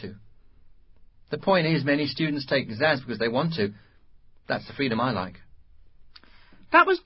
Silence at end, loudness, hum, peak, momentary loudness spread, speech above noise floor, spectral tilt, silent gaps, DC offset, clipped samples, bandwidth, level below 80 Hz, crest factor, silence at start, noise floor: 0.05 s; -25 LUFS; none; -4 dBFS; 11 LU; 28 dB; -10 dB/octave; none; under 0.1%; under 0.1%; 5.8 kHz; -58 dBFS; 22 dB; 0 s; -52 dBFS